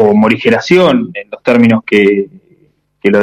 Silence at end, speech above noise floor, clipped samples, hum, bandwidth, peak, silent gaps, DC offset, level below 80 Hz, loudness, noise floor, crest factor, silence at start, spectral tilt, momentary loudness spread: 0 s; 44 dB; under 0.1%; none; 9.8 kHz; 0 dBFS; none; under 0.1%; -52 dBFS; -10 LUFS; -53 dBFS; 10 dB; 0 s; -6.5 dB/octave; 9 LU